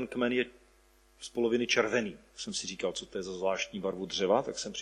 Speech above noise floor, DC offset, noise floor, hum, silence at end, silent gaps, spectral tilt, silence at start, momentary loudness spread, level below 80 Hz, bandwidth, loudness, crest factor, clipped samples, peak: 31 dB; under 0.1%; -64 dBFS; none; 0 s; none; -3 dB/octave; 0 s; 12 LU; -64 dBFS; 11.5 kHz; -32 LUFS; 20 dB; under 0.1%; -12 dBFS